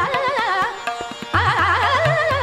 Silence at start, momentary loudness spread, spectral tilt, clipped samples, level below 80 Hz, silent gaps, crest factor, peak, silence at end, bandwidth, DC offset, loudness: 0 s; 10 LU; -4.5 dB/octave; under 0.1%; -44 dBFS; none; 14 dB; -4 dBFS; 0 s; 15.5 kHz; under 0.1%; -19 LUFS